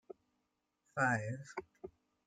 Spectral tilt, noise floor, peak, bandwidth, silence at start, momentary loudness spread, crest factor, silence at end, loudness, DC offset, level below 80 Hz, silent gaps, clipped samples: -6 dB/octave; -84 dBFS; -20 dBFS; 9.4 kHz; 0.1 s; 23 LU; 22 dB; 0.4 s; -38 LUFS; under 0.1%; -76 dBFS; none; under 0.1%